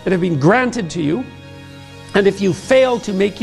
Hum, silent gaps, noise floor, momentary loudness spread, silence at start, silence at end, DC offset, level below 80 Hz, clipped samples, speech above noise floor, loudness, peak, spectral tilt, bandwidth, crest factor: none; none; -36 dBFS; 23 LU; 0 s; 0 s; under 0.1%; -48 dBFS; under 0.1%; 21 dB; -16 LUFS; -2 dBFS; -6 dB/octave; 12 kHz; 14 dB